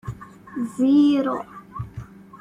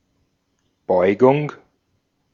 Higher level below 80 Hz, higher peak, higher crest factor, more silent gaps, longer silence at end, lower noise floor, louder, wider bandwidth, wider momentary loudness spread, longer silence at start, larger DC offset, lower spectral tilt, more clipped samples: first, -52 dBFS vs -66 dBFS; second, -8 dBFS vs -2 dBFS; second, 14 dB vs 20 dB; neither; second, 0.05 s vs 0.8 s; second, -39 dBFS vs -69 dBFS; about the same, -20 LUFS vs -18 LUFS; first, 11 kHz vs 7 kHz; first, 21 LU vs 16 LU; second, 0.05 s vs 0.9 s; neither; about the same, -7.5 dB/octave vs -8.5 dB/octave; neither